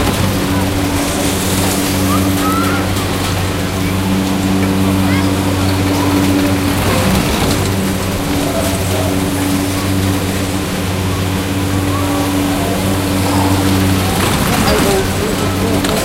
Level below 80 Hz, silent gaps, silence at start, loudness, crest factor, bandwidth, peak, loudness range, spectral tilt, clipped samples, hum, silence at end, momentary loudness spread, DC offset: -28 dBFS; none; 0 s; -14 LUFS; 14 dB; 16 kHz; 0 dBFS; 2 LU; -5 dB/octave; under 0.1%; none; 0 s; 4 LU; under 0.1%